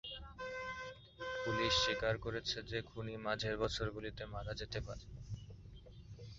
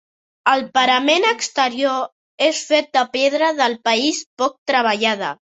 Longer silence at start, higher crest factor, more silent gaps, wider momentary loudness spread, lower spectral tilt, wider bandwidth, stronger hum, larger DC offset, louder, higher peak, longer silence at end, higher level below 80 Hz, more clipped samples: second, 0.05 s vs 0.45 s; about the same, 20 dB vs 18 dB; second, none vs 2.12-2.38 s, 4.26-4.37 s, 4.58-4.66 s; first, 18 LU vs 6 LU; about the same, -2.5 dB/octave vs -1.5 dB/octave; second, 7.6 kHz vs 8.4 kHz; neither; neither; second, -40 LUFS vs -18 LUFS; second, -22 dBFS vs -2 dBFS; second, 0 s vs 0.15 s; first, -56 dBFS vs -68 dBFS; neither